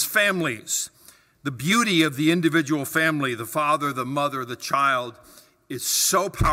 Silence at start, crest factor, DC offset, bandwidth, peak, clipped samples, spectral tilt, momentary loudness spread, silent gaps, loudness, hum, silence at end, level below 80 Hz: 0 s; 18 dB; under 0.1%; 16 kHz; -6 dBFS; under 0.1%; -3.5 dB/octave; 10 LU; none; -22 LUFS; none; 0 s; -44 dBFS